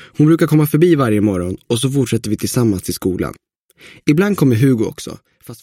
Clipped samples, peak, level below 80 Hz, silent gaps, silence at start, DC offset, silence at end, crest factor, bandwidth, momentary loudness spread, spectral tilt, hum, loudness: under 0.1%; 0 dBFS; -46 dBFS; 3.58-3.69 s; 0 s; under 0.1%; 0.05 s; 14 dB; 16.5 kHz; 10 LU; -6.5 dB/octave; none; -15 LUFS